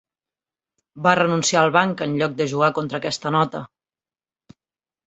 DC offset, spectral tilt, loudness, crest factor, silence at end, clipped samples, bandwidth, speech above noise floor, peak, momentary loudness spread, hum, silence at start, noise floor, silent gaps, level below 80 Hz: under 0.1%; -4.5 dB/octave; -20 LUFS; 20 dB; 1.4 s; under 0.1%; 8.4 kHz; over 70 dB; -2 dBFS; 8 LU; none; 0.95 s; under -90 dBFS; none; -64 dBFS